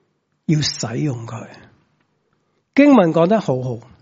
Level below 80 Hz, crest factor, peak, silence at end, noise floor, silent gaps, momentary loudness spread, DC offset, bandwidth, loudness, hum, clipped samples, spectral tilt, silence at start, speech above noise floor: -58 dBFS; 18 dB; 0 dBFS; 0.2 s; -66 dBFS; none; 18 LU; under 0.1%; 7.8 kHz; -17 LUFS; none; under 0.1%; -6 dB/octave; 0.5 s; 50 dB